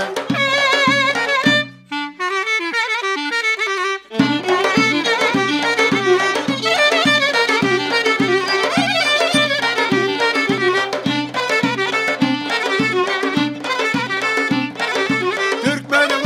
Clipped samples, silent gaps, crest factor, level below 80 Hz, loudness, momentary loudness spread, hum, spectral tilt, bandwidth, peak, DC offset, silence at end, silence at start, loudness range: under 0.1%; none; 16 dB; -64 dBFS; -16 LUFS; 6 LU; none; -3.5 dB/octave; 15.5 kHz; -2 dBFS; under 0.1%; 0 s; 0 s; 3 LU